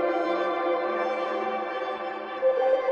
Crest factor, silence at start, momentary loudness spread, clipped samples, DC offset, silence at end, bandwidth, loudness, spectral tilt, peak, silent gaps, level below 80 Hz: 14 dB; 0 s; 7 LU; under 0.1%; under 0.1%; 0 s; 6.8 kHz; -27 LUFS; -5 dB/octave; -12 dBFS; none; -72 dBFS